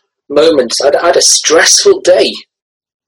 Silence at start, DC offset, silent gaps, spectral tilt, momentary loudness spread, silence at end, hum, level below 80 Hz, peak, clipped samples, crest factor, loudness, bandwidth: 0.3 s; under 0.1%; none; -0.5 dB/octave; 8 LU; 0.65 s; none; -50 dBFS; 0 dBFS; 1%; 10 dB; -7 LUFS; over 20 kHz